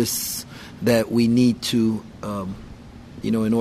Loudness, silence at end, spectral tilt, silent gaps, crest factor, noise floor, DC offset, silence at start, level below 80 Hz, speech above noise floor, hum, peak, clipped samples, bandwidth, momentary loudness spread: -22 LUFS; 0 s; -5 dB/octave; none; 18 dB; -41 dBFS; under 0.1%; 0 s; -48 dBFS; 20 dB; none; -4 dBFS; under 0.1%; 15.5 kHz; 20 LU